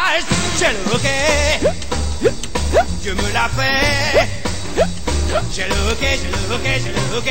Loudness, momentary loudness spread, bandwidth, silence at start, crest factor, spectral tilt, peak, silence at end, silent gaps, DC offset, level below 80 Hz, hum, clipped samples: -17 LUFS; 6 LU; 16.5 kHz; 0 s; 14 dB; -3.5 dB/octave; -4 dBFS; 0 s; none; 6%; -26 dBFS; none; under 0.1%